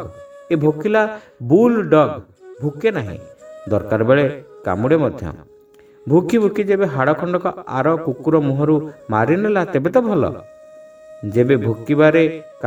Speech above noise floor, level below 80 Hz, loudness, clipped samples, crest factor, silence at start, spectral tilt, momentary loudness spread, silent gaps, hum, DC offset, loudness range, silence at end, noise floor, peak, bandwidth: 31 dB; -52 dBFS; -17 LUFS; under 0.1%; 18 dB; 0 s; -8.5 dB/octave; 14 LU; none; none; under 0.1%; 2 LU; 0 s; -47 dBFS; 0 dBFS; 13 kHz